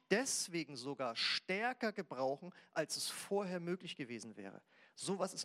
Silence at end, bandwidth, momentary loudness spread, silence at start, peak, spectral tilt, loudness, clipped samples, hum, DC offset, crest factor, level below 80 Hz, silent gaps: 0 s; 16 kHz; 12 LU; 0.1 s; -18 dBFS; -3 dB/octave; -40 LUFS; under 0.1%; none; under 0.1%; 22 dB; under -90 dBFS; none